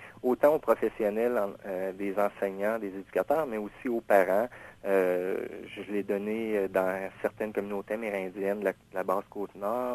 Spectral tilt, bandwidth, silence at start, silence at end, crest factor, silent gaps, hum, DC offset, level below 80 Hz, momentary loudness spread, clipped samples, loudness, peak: -6.5 dB/octave; 14 kHz; 0 s; 0 s; 20 dB; none; none; under 0.1%; -66 dBFS; 10 LU; under 0.1%; -30 LUFS; -8 dBFS